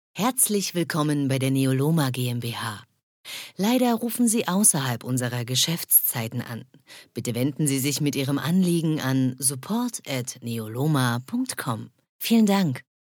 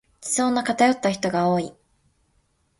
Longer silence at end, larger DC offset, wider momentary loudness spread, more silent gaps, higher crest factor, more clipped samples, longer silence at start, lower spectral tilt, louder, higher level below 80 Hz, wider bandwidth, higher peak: second, 0.25 s vs 1.1 s; neither; first, 13 LU vs 6 LU; first, 3.03-3.24 s, 12.09-12.19 s vs none; about the same, 18 dB vs 18 dB; neither; about the same, 0.15 s vs 0.2 s; about the same, -4.5 dB/octave vs -4 dB/octave; about the same, -23 LUFS vs -22 LUFS; second, -72 dBFS vs -62 dBFS; first, 19.5 kHz vs 11.5 kHz; about the same, -6 dBFS vs -6 dBFS